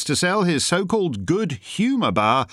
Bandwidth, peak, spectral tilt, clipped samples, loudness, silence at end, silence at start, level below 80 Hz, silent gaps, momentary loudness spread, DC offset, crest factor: 14 kHz; -4 dBFS; -4.5 dB/octave; under 0.1%; -21 LUFS; 0.05 s; 0 s; -56 dBFS; none; 4 LU; under 0.1%; 16 dB